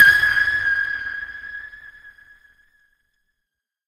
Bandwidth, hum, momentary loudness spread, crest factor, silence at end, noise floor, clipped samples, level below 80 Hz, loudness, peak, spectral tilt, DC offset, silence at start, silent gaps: 16 kHz; none; 21 LU; 22 dB; 1.75 s; -81 dBFS; under 0.1%; -52 dBFS; -18 LUFS; 0 dBFS; -1 dB/octave; under 0.1%; 0 s; none